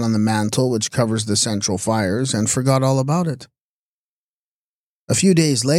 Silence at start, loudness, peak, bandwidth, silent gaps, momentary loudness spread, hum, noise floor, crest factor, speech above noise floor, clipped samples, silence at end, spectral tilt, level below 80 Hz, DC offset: 0 s; -18 LUFS; -4 dBFS; 15 kHz; 3.61-5.07 s; 5 LU; none; under -90 dBFS; 16 dB; over 72 dB; under 0.1%; 0 s; -4.5 dB/octave; -56 dBFS; under 0.1%